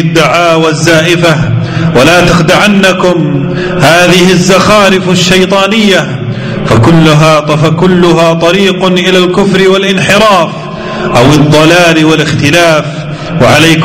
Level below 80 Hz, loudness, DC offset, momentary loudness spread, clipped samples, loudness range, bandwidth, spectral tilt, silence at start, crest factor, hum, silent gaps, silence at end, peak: -30 dBFS; -5 LUFS; under 0.1%; 7 LU; 2%; 1 LU; 16.5 kHz; -5 dB/octave; 0 s; 6 dB; none; none; 0 s; 0 dBFS